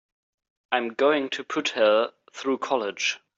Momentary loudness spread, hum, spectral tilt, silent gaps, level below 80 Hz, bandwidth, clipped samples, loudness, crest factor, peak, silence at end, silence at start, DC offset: 8 LU; none; -2.5 dB/octave; none; -78 dBFS; 7.8 kHz; under 0.1%; -25 LUFS; 20 dB; -6 dBFS; 0.2 s; 0.7 s; under 0.1%